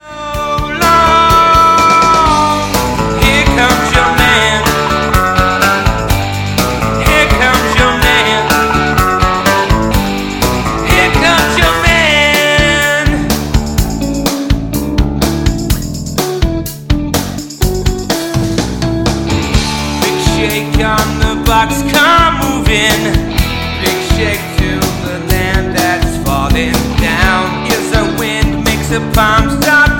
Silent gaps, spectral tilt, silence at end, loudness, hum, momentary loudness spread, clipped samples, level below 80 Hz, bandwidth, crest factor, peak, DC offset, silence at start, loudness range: none; -4 dB/octave; 0 s; -11 LUFS; none; 8 LU; under 0.1%; -20 dBFS; 17.5 kHz; 10 dB; 0 dBFS; under 0.1%; 0.05 s; 6 LU